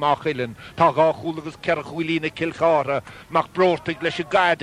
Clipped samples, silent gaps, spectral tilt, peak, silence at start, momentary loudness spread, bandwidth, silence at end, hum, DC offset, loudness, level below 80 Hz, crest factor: under 0.1%; none; -6 dB/octave; -4 dBFS; 0 s; 9 LU; 12 kHz; 0 s; none; under 0.1%; -22 LUFS; -56 dBFS; 18 dB